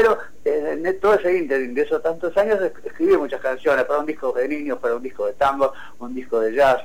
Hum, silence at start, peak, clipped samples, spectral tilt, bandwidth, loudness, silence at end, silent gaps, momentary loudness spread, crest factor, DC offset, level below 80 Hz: none; 0 s; -8 dBFS; under 0.1%; -5.5 dB/octave; 16.5 kHz; -21 LUFS; 0 s; none; 7 LU; 12 dB; 2%; -50 dBFS